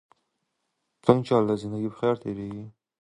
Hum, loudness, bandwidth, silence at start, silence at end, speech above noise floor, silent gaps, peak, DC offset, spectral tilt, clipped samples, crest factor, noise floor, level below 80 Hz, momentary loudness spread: none; -26 LUFS; 11 kHz; 1.05 s; 0.3 s; 53 dB; none; -2 dBFS; under 0.1%; -8 dB/octave; under 0.1%; 24 dB; -78 dBFS; -62 dBFS; 14 LU